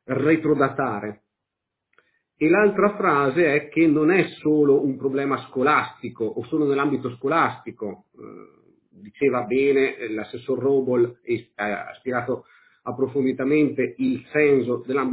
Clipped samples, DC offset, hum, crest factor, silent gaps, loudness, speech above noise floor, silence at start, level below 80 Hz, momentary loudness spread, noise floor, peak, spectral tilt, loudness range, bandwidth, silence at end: under 0.1%; under 0.1%; none; 18 dB; none; -22 LUFS; 61 dB; 0.1 s; -62 dBFS; 12 LU; -83 dBFS; -4 dBFS; -10.5 dB/octave; 6 LU; 4 kHz; 0 s